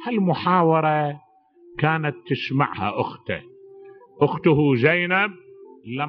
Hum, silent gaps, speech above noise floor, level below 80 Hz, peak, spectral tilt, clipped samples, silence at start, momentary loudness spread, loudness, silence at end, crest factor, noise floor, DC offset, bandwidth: none; none; 30 dB; -60 dBFS; -2 dBFS; -5 dB/octave; under 0.1%; 0 s; 13 LU; -21 LUFS; 0 s; 20 dB; -51 dBFS; under 0.1%; 5.8 kHz